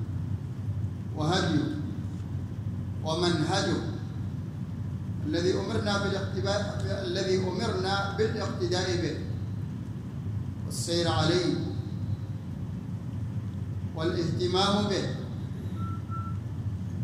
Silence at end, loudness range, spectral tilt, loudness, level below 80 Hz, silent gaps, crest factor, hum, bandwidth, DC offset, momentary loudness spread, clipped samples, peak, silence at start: 0 s; 2 LU; -6 dB/octave; -30 LUFS; -52 dBFS; none; 18 dB; none; 13 kHz; under 0.1%; 10 LU; under 0.1%; -12 dBFS; 0 s